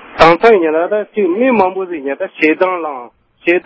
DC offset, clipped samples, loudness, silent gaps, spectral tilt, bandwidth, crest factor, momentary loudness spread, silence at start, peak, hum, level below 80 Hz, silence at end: under 0.1%; 0.5%; -13 LUFS; none; -6.5 dB/octave; 8 kHz; 12 dB; 12 LU; 0.05 s; 0 dBFS; none; -44 dBFS; 0.05 s